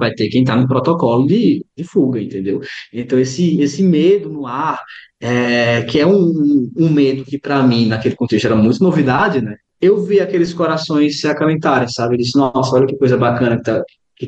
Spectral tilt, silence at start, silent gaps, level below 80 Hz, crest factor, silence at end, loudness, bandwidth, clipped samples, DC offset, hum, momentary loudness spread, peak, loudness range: -7 dB/octave; 0 s; none; -52 dBFS; 12 dB; 0 s; -15 LUFS; 8.4 kHz; under 0.1%; under 0.1%; none; 8 LU; -2 dBFS; 2 LU